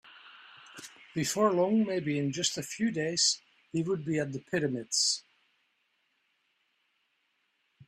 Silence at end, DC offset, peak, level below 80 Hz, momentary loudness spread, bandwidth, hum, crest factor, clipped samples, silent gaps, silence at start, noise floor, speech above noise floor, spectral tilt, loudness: 2.7 s; under 0.1%; -14 dBFS; -72 dBFS; 11 LU; 15 kHz; none; 18 dB; under 0.1%; none; 0.05 s; -76 dBFS; 46 dB; -3.5 dB/octave; -30 LUFS